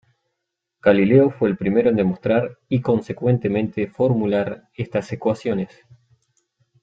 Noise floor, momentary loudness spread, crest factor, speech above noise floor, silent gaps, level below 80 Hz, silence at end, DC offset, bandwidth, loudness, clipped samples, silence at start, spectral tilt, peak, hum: -80 dBFS; 10 LU; 18 dB; 60 dB; none; -56 dBFS; 1.15 s; under 0.1%; 7.8 kHz; -20 LUFS; under 0.1%; 0.85 s; -9 dB/octave; -2 dBFS; none